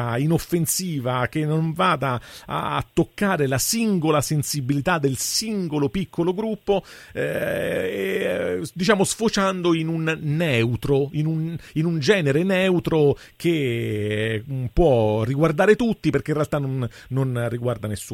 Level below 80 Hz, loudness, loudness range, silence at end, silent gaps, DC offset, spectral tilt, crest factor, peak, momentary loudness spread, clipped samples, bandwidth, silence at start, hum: -44 dBFS; -22 LUFS; 3 LU; 0 s; none; under 0.1%; -5 dB/octave; 18 dB; -4 dBFS; 7 LU; under 0.1%; 16.5 kHz; 0 s; none